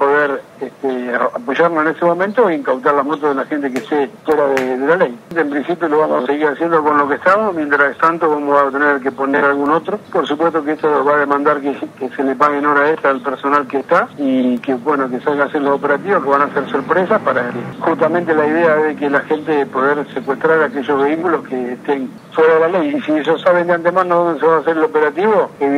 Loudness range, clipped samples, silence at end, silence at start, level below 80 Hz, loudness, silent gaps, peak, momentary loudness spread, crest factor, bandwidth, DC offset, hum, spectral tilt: 2 LU; under 0.1%; 0 s; 0 s; -66 dBFS; -15 LUFS; none; 0 dBFS; 6 LU; 14 dB; 11 kHz; under 0.1%; none; -6.5 dB/octave